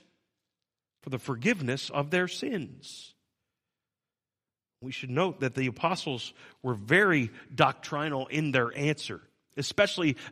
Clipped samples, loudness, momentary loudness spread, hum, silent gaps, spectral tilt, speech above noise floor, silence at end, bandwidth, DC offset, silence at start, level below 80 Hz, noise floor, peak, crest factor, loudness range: under 0.1%; -29 LUFS; 16 LU; none; none; -5 dB/octave; over 61 dB; 0 s; 15 kHz; under 0.1%; 1.05 s; -70 dBFS; under -90 dBFS; -6 dBFS; 26 dB; 8 LU